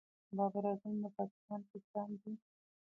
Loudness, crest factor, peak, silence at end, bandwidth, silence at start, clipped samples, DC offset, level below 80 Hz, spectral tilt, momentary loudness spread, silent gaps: -42 LUFS; 20 dB; -24 dBFS; 0.55 s; 2.9 kHz; 0.3 s; under 0.1%; under 0.1%; under -90 dBFS; -11 dB/octave; 11 LU; 1.31-1.48 s, 1.70-1.74 s, 1.84-1.94 s